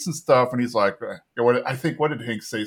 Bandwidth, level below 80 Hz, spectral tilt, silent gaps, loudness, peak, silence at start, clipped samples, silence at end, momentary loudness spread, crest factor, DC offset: 18 kHz; -68 dBFS; -5.5 dB/octave; none; -22 LUFS; -4 dBFS; 0 s; under 0.1%; 0 s; 10 LU; 20 dB; under 0.1%